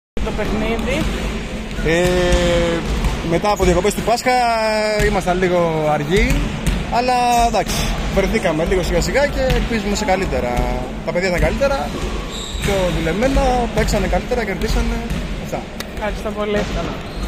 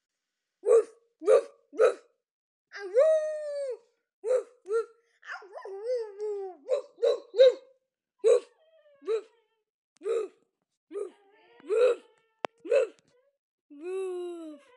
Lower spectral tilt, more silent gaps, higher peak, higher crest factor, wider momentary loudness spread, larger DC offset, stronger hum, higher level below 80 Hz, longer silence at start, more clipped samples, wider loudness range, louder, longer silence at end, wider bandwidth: first, -5 dB/octave vs -2 dB/octave; second, none vs 2.31-2.65 s, 4.13-4.22 s, 9.70-9.96 s, 10.77-10.87 s, 13.39-13.69 s; first, -2 dBFS vs -8 dBFS; about the same, 16 dB vs 20 dB; second, 9 LU vs 19 LU; neither; neither; first, -24 dBFS vs under -90 dBFS; second, 0.15 s vs 0.65 s; neither; second, 3 LU vs 7 LU; first, -18 LUFS vs -28 LUFS; second, 0 s vs 0.2 s; first, 16 kHz vs 10.5 kHz